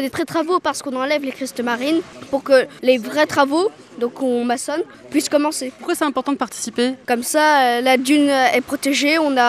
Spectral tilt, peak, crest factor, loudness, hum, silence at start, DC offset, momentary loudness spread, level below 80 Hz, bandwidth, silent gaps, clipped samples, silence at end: -2.5 dB/octave; -2 dBFS; 16 dB; -18 LUFS; none; 0 s; under 0.1%; 9 LU; -62 dBFS; 15.5 kHz; none; under 0.1%; 0 s